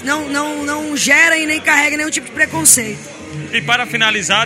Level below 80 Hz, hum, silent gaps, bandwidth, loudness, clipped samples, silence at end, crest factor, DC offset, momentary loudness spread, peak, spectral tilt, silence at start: -54 dBFS; none; none; over 20 kHz; -13 LUFS; under 0.1%; 0 s; 16 dB; under 0.1%; 11 LU; 0 dBFS; -1.5 dB/octave; 0 s